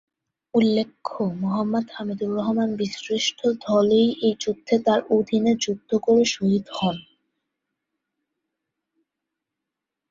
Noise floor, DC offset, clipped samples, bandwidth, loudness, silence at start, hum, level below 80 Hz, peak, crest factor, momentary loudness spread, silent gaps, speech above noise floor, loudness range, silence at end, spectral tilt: -85 dBFS; under 0.1%; under 0.1%; 7.6 kHz; -22 LUFS; 0.55 s; none; -64 dBFS; -6 dBFS; 18 dB; 9 LU; none; 63 dB; 6 LU; 3.1 s; -5 dB/octave